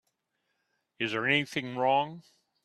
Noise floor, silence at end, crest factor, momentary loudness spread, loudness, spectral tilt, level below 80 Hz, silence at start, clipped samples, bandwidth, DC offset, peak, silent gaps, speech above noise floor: -80 dBFS; 0.45 s; 22 dB; 8 LU; -29 LUFS; -5 dB/octave; -74 dBFS; 1 s; under 0.1%; 13 kHz; under 0.1%; -10 dBFS; none; 51 dB